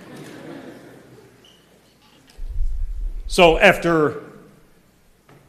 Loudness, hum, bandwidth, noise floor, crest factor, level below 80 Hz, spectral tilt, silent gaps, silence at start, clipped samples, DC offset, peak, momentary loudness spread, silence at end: -17 LUFS; none; 14.5 kHz; -55 dBFS; 22 dB; -30 dBFS; -4.5 dB/octave; none; 0 s; under 0.1%; under 0.1%; 0 dBFS; 25 LU; 1.2 s